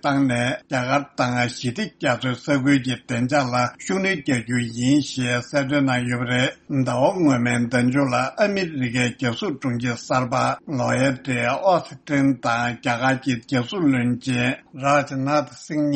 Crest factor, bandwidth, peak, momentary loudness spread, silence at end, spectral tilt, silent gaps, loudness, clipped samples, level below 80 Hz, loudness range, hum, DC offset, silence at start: 16 dB; 8.8 kHz; -4 dBFS; 5 LU; 0 s; -5.5 dB/octave; none; -22 LUFS; under 0.1%; -56 dBFS; 2 LU; none; under 0.1%; 0.05 s